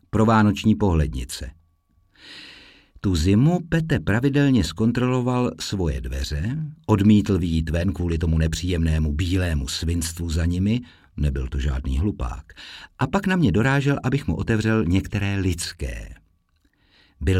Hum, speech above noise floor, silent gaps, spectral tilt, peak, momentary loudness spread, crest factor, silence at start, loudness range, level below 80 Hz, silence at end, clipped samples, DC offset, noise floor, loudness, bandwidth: none; 43 dB; none; -6.5 dB/octave; -6 dBFS; 14 LU; 16 dB; 0.15 s; 4 LU; -32 dBFS; 0 s; under 0.1%; under 0.1%; -64 dBFS; -22 LUFS; 15 kHz